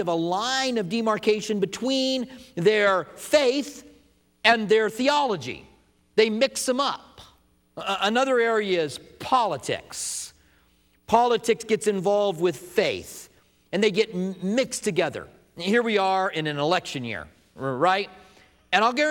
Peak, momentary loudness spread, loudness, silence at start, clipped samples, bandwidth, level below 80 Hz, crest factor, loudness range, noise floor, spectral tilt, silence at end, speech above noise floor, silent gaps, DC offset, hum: -4 dBFS; 13 LU; -24 LUFS; 0 s; under 0.1%; 18 kHz; -64 dBFS; 22 dB; 3 LU; -62 dBFS; -3.5 dB/octave; 0 s; 39 dB; none; under 0.1%; none